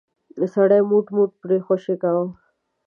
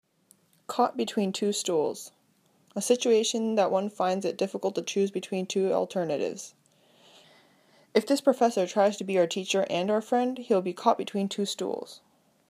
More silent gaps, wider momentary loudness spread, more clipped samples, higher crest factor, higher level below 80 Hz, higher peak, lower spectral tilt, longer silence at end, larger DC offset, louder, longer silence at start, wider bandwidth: neither; about the same, 8 LU vs 10 LU; neither; about the same, 16 dB vs 20 dB; first, -72 dBFS vs -82 dBFS; first, -4 dBFS vs -8 dBFS; first, -10 dB/octave vs -4 dB/octave; about the same, 0.55 s vs 0.5 s; neither; first, -20 LUFS vs -27 LUFS; second, 0.35 s vs 0.7 s; second, 3.4 kHz vs 15.5 kHz